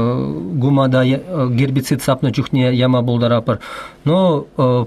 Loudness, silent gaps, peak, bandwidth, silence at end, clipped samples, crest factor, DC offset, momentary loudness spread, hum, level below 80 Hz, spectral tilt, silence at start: -16 LUFS; none; -4 dBFS; 14 kHz; 0 s; under 0.1%; 12 dB; under 0.1%; 7 LU; none; -48 dBFS; -7 dB/octave; 0 s